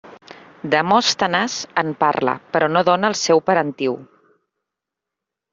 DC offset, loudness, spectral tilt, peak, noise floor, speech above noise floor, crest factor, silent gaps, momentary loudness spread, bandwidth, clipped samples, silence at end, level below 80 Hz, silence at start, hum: under 0.1%; -18 LUFS; -3.5 dB/octave; -2 dBFS; -84 dBFS; 66 dB; 18 dB; none; 7 LU; 7.8 kHz; under 0.1%; 1.5 s; -64 dBFS; 0.05 s; none